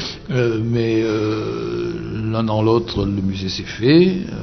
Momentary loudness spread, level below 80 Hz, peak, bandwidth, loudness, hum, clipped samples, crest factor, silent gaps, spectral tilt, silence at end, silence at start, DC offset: 10 LU; -40 dBFS; -2 dBFS; 6.4 kHz; -19 LUFS; none; under 0.1%; 16 dB; none; -7 dB/octave; 0 s; 0 s; under 0.1%